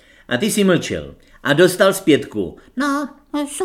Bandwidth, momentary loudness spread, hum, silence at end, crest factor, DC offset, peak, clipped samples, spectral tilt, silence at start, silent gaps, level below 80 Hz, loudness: 16.5 kHz; 13 LU; none; 0 s; 18 dB; under 0.1%; 0 dBFS; under 0.1%; -4.5 dB/octave; 0.3 s; none; -50 dBFS; -18 LUFS